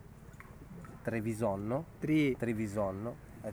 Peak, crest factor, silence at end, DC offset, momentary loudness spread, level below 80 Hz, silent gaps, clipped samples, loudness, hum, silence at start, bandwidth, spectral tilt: -20 dBFS; 16 dB; 0 s; under 0.1%; 22 LU; -58 dBFS; none; under 0.1%; -35 LUFS; none; 0 s; over 20 kHz; -7 dB/octave